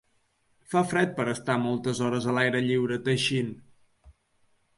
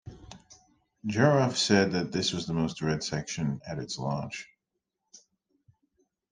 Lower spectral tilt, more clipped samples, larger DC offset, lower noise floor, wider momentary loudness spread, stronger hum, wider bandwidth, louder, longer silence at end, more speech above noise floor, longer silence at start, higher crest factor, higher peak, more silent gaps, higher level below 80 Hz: about the same, -5.5 dB/octave vs -5 dB/octave; neither; neither; second, -69 dBFS vs -85 dBFS; second, 5 LU vs 16 LU; neither; first, 11.5 kHz vs 10 kHz; about the same, -27 LUFS vs -28 LUFS; second, 0.7 s vs 1.15 s; second, 43 dB vs 57 dB; first, 0.7 s vs 0.05 s; second, 18 dB vs 24 dB; second, -10 dBFS vs -6 dBFS; neither; about the same, -64 dBFS vs -60 dBFS